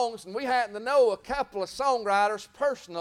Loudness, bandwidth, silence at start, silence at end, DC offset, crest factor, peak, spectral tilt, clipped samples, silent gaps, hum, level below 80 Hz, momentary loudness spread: -27 LUFS; 15 kHz; 0 s; 0 s; under 0.1%; 14 dB; -12 dBFS; -3 dB/octave; under 0.1%; none; none; -58 dBFS; 8 LU